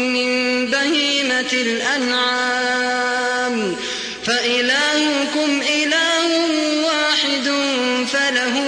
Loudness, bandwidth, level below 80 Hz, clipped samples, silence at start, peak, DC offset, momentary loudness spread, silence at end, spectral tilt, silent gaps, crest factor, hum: -17 LUFS; 10.5 kHz; -60 dBFS; under 0.1%; 0 s; -4 dBFS; under 0.1%; 4 LU; 0 s; -1.5 dB/octave; none; 14 dB; none